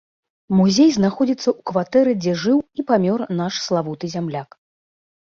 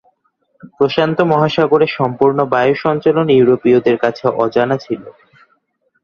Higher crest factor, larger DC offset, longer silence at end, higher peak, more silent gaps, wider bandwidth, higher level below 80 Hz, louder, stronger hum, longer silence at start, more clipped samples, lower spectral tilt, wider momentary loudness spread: about the same, 16 dB vs 14 dB; neither; about the same, 0.95 s vs 0.9 s; second, -4 dBFS vs 0 dBFS; neither; about the same, 7.4 kHz vs 6.8 kHz; about the same, -58 dBFS vs -54 dBFS; second, -19 LUFS vs -14 LUFS; neither; second, 0.5 s vs 0.65 s; neither; second, -6 dB/octave vs -8 dB/octave; first, 11 LU vs 6 LU